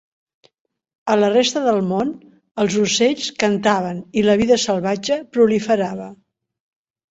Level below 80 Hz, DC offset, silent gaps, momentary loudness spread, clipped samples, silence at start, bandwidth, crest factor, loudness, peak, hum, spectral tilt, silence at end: -56 dBFS; under 0.1%; 2.51-2.55 s; 10 LU; under 0.1%; 1.05 s; 8 kHz; 16 dB; -18 LUFS; -2 dBFS; none; -4.5 dB/octave; 0.95 s